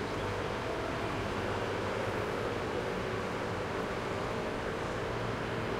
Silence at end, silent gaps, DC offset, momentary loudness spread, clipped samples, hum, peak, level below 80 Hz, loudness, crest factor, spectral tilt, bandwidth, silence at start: 0 s; none; under 0.1%; 1 LU; under 0.1%; none; -22 dBFS; -50 dBFS; -35 LUFS; 14 dB; -5.5 dB/octave; 16 kHz; 0 s